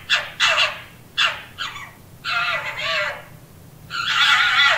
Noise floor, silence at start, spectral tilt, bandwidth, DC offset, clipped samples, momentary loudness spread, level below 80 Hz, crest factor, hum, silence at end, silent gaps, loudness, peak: -44 dBFS; 0 s; 0 dB/octave; 16 kHz; under 0.1%; under 0.1%; 17 LU; -56 dBFS; 18 dB; none; 0 s; none; -19 LUFS; -2 dBFS